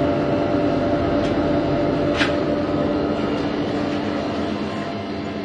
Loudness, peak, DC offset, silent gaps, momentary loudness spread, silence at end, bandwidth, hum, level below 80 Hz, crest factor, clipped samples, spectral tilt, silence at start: -21 LUFS; -4 dBFS; under 0.1%; none; 6 LU; 0 s; 9.4 kHz; none; -42 dBFS; 16 dB; under 0.1%; -7 dB/octave; 0 s